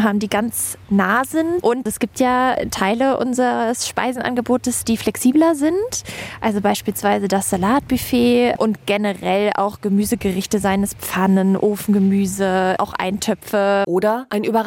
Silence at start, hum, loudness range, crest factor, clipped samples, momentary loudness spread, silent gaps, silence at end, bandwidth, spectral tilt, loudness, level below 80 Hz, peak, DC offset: 0 s; none; 1 LU; 14 dB; under 0.1%; 5 LU; none; 0 s; 17 kHz; -5 dB/octave; -18 LUFS; -48 dBFS; -4 dBFS; under 0.1%